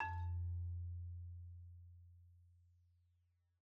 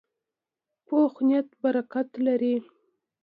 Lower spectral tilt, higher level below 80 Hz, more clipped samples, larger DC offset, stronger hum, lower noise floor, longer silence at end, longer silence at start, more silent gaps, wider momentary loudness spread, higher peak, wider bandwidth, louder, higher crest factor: second, -6 dB/octave vs -9 dB/octave; first, -58 dBFS vs -82 dBFS; neither; neither; neither; second, -80 dBFS vs -88 dBFS; first, 0.95 s vs 0.6 s; second, 0 s vs 0.9 s; neither; first, 21 LU vs 6 LU; second, -32 dBFS vs -12 dBFS; second, 4 kHz vs 4.8 kHz; second, -48 LUFS vs -26 LUFS; about the same, 18 dB vs 16 dB